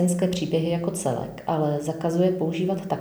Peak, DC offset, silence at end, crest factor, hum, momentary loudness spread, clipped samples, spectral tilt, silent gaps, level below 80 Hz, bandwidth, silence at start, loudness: -10 dBFS; under 0.1%; 0 s; 14 dB; none; 5 LU; under 0.1%; -6.5 dB/octave; none; -56 dBFS; over 20 kHz; 0 s; -25 LUFS